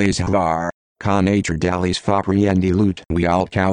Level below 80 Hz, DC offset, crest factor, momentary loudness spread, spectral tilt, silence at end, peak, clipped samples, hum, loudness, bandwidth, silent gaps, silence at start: -38 dBFS; under 0.1%; 14 dB; 4 LU; -6 dB/octave; 0 s; -4 dBFS; under 0.1%; none; -19 LUFS; 10.5 kHz; 0.74-0.95 s; 0 s